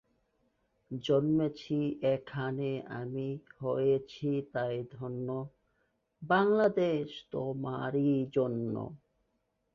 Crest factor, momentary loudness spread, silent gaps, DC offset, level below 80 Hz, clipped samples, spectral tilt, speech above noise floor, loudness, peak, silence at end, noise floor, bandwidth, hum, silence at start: 18 dB; 12 LU; none; under 0.1%; -68 dBFS; under 0.1%; -8 dB/octave; 47 dB; -32 LUFS; -14 dBFS; 0.8 s; -79 dBFS; 7.2 kHz; none; 0.9 s